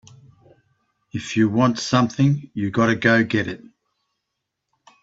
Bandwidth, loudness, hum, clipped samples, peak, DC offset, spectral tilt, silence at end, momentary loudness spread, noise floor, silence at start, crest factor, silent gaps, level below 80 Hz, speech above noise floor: 8 kHz; -20 LUFS; none; under 0.1%; -2 dBFS; under 0.1%; -6 dB/octave; 1.45 s; 14 LU; -80 dBFS; 1.15 s; 20 dB; none; -58 dBFS; 60 dB